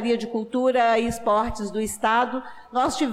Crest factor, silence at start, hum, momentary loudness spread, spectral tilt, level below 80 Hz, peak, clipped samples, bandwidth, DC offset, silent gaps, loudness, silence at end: 12 dB; 0 s; none; 8 LU; -4 dB/octave; -48 dBFS; -12 dBFS; under 0.1%; 15.5 kHz; under 0.1%; none; -23 LUFS; 0 s